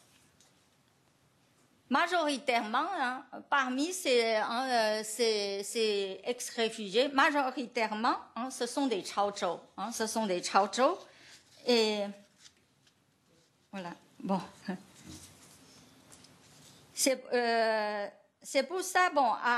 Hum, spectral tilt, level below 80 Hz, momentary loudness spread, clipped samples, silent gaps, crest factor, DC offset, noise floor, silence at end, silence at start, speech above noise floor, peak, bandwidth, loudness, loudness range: none; -2.5 dB/octave; -80 dBFS; 15 LU; under 0.1%; none; 22 dB; under 0.1%; -69 dBFS; 0 s; 1.9 s; 38 dB; -12 dBFS; 13 kHz; -31 LUFS; 12 LU